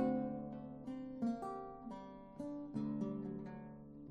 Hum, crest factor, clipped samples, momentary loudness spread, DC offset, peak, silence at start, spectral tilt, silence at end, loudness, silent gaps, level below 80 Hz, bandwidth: none; 20 dB; under 0.1%; 11 LU; under 0.1%; -24 dBFS; 0 s; -9 dB/octave; 0 s; -45 LUFS; none; -68 dBFS; 9 kHz